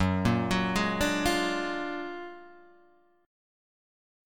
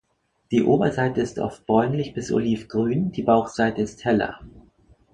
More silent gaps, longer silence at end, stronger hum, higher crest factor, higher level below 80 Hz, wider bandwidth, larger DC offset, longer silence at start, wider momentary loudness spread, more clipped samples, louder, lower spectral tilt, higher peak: neither; first, 1 s vs 0.55 s; neither; about the same, 20 dB vs 20 dB; about the same, -48 dBFS vs -52 dBFS; first, 18 kHz vs 9.4 kHz; first, 0.3% vs under 0.1%; second, 0 s vs 0.5 s; first, 15 LU vs 7 LU; neither; second, -28 LUFS vs -23 LUFS; second, -5 dB/octave vs -7 dB/octave; second, -12 dBFS vs -4 dBFS